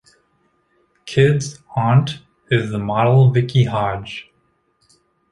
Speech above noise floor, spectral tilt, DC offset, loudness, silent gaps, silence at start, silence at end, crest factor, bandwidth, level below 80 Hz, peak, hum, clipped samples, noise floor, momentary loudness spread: 48 dB; -7 dB/octave; under 0.1%; -17 LUFS; none; 1.05 s; 1.1 s; 16 dB; 11 kHz; -50 dBFS; -2 dBFS; none; under 0.1%; -64 dBFS; 17 LU